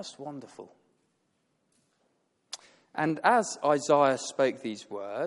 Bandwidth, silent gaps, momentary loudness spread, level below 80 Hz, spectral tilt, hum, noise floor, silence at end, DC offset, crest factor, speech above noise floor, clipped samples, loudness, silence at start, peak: 11.5 kHz; none; 20 LU; -78 dBFS; -4 dB/octave; none; -75 dBFS; 0 s; under 0.1%; 20 dB; 47 dB; under 0.1%; -27 LUFS; 0 s; -10 dBFS